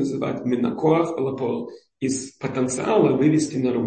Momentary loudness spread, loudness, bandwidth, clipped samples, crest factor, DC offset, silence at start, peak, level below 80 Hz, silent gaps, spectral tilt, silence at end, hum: 10 LU; -22 LUFS; 8.8 kHz; under 0.1%; 16 dB; under 0.1%; 0 s; -4 dBFS; -60 dBFS; none; -6 dB/octave; 0 s; none